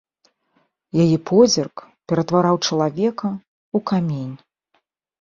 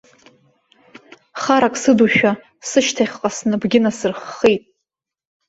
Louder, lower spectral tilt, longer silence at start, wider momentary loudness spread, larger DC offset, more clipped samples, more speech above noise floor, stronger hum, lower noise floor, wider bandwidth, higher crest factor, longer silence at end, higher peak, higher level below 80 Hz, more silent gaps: about the same, -19 LUFS vs -17 LUFS; first, -6 dB/octave vs -4 dB/octave; second, 0.95 s vs 1.35 s; first, 15 LU vs 10 LU; neither; neither; second, 50 dB vs 64 dB; neither; second, -68 dBFS vs -80 dBFS; about the same, 7.4 kHz vs 8 kHz; about the same, 18 dB vs 18 dB; about the same, 0.85 s vs 0.9 s; about the same, -2 dBFS vs -2 dBFS; about the same, -58 dBFS vs -58 dBFS; first, 3.48-3.72 s vs none